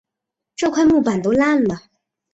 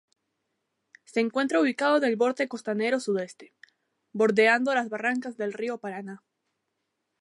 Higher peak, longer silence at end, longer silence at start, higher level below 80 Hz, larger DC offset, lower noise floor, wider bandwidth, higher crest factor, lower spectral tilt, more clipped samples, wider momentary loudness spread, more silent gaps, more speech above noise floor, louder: first, -4 dBFS vs -8 dBFS; second, 0.55 s vs 1.05 s; second, 0.6 s vs 1.1 s; first, -50 dBFS vs -82 dBFS; neither; about the same, -83 dBFS vs -80 dBFS; second, 8 kHz vs 11.5 kHz; second, 14 dB vs 20 dB; about the same, -5.5 dB/octave vs -4.5 dB/octave; neither; about the same, 13 LU vs 15 LU; neither; first, 67 dB vs 54 dB; first, -17 LUFS vs -26 LUFS